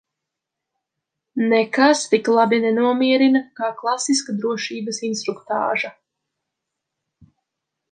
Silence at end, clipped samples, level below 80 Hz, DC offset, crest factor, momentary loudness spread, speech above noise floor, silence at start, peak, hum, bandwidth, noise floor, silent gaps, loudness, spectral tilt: 2 s; under 0.1%; -72 dBFS; under 0.1%; 20 dB; 10 LU; 64 dB; 1.35 s; -2 dBFS; none; 9.6 kHz; -83 dBFS; none; -19 LUFS; -3.5 dB/octave